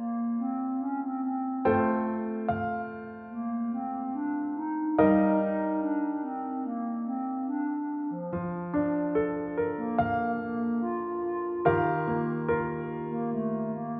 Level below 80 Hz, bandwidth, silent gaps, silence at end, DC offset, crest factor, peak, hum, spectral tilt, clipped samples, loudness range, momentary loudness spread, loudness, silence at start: -60 dBFS; 3.8 kHz; none; 0 s; under 0.1%; 20 dB; -10 dBFS; none; -8 dB/octave; under 0.1%; 3 LU; 8 LU; -30 LUFS; 0 s